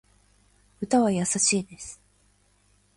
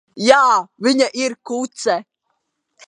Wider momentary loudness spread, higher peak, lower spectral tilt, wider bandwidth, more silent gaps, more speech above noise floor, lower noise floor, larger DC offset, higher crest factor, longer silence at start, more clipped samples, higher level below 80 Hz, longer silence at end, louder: first, 18 LU vs 12 LU; second, -10 dBFS vs 0 dBFS; about the same, -3.5 dB/octave vs -3 dB/octave; about the same, 11.5 kHz vs 11 kHz; neither; second, 39 dB vs 55 dB; second, -64 dBFS vs -72 dBFS; neither; about the same, 20 dB vs 18 dB; first, 0.8 s vs 0.15 s; neither; about the same, -62 dBFS vs -66 dBFS; first, 1.05 s vs 0.85 s; second, -23 LUFS vs -17 LUFS